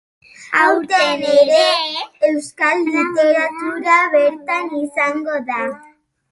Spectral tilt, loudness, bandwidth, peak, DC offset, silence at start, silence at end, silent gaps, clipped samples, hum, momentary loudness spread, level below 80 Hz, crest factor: -2.5 dB/octave; -16 LUFS; 11.5 kHz; -2 dBFS; under 0.1%; 0.4 s; 0.55 s; none; under 0.1%; none; 10 LU; -68 dBFS; 16 dB